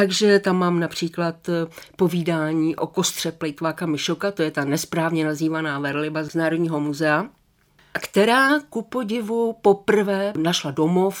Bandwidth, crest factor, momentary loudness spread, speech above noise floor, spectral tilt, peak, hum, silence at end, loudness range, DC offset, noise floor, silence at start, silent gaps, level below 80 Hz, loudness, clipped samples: over 20 kHz; 18 dB; 9 LU; 37 dB; -5 dB/octave; -4 dBFS; none; 0 s; 3 LU; under 0.1%; -59 dBFS; 0 s; none; -64 dBFS; -22 LUFS; under 0.1%